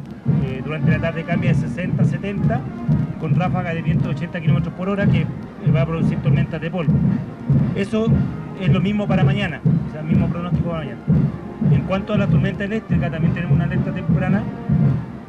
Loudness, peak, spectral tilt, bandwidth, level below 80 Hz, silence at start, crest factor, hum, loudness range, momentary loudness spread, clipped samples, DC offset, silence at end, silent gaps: -20 LUFS; -8 dBFS; -9 dB/octave; 6.6 kHz; -38 dBFS; 0 s; 12 dB; none; 1 LU; 5 LU; under 0.1%; under 0.1%; 0 s; none